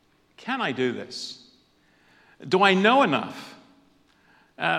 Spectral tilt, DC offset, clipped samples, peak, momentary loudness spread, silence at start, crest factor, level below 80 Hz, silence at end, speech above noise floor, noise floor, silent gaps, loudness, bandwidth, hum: -5 dB/octave; under 0.1%; under 0.1%; -2 dBFS; 24 LU; 0.45 s; 24 dB; -76 dBFS; 0 s; 39 dB; -62 dBFS; none; -23 LUFS; 11.5 kHz; none